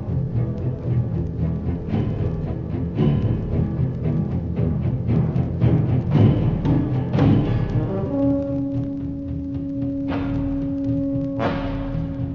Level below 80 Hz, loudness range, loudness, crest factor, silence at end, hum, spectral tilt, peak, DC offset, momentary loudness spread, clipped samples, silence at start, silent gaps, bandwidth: -32 dBFS; 5 LU; -22 LUFS; 16 dB; 0 s; none; -10.5 dB/octave; -4 dBFS; 0.2%; 8 LU; under 0.1%; 0 s; none; 5.8 kHz